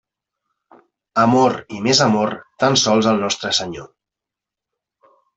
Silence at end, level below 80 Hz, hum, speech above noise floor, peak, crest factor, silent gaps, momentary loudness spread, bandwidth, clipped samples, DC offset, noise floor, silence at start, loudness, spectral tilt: 1.5 s; -58 dBFS; none; 69 dB; 0 dBFS; 20 dB; none; 10 LU; 8.2 kHz; under 0.1%; under 0.1%; -86 dBFS; 1.15 s; -17 LUFS; -4 dB/octave